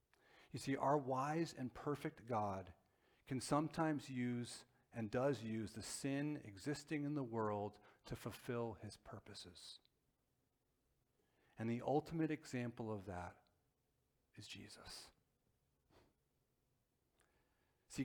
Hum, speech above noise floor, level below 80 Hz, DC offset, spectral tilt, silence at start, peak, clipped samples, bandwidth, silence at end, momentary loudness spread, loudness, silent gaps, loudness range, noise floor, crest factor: none; 41 dB; -74 dBFS; under 0.1%; -6 dB/octave; 0.35 s; -24 dBFS; under 0.1%; 20 kHz; 0 s; 15 LU; -44 LUFS; none; 17 LU; -85 dBFS; 22 dB